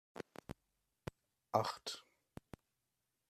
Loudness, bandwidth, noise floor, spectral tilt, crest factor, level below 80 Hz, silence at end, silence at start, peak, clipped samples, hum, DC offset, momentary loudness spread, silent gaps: -44 LUFS; 14.5 kHz; -88 dBFS; -4.5 dB/octave; 30 dB; -72 dBFS; 1.3 s; 0.15 s; -18 dBFS; under 0.1%; none; under 0.1%; 22 LU; none